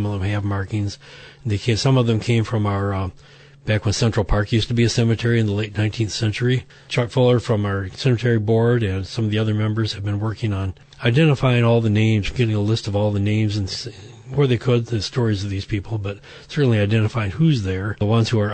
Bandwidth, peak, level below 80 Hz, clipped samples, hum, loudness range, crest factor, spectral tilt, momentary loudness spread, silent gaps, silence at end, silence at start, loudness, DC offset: 9 kHz; -6 dBFS; -40 dBFS; under 0.1%; none; 3 LU; 14 dB; -6.5 dB/octave; 9 LU; none; 0 s; 0 s; -20 LUFS; under 0.1%